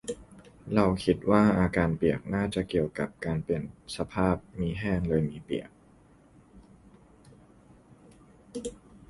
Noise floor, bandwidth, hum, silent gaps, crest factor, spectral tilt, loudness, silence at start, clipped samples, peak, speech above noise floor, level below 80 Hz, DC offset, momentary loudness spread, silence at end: -58 dBFS; 11.5 kHz; none; none; 22 dB; -7 dB/octave; -29 LUFS; 0.05 s; under 0.1%; -8 dBFS; 30 dB; -48 dBFS; under 0.1%; 16 LU; 0.15 s